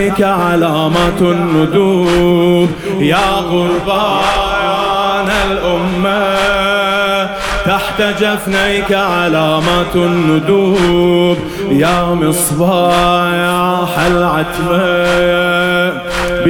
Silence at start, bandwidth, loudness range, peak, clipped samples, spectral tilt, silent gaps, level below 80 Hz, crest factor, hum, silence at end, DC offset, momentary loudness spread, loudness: 0 s; 19 kHz; 2 LU; 0 dBFS; under 0.1%; -5 dB/octave; none; -32 dBFS; 12 dB; none; 0 s; 0.3%; 4 LU; -12 LUFS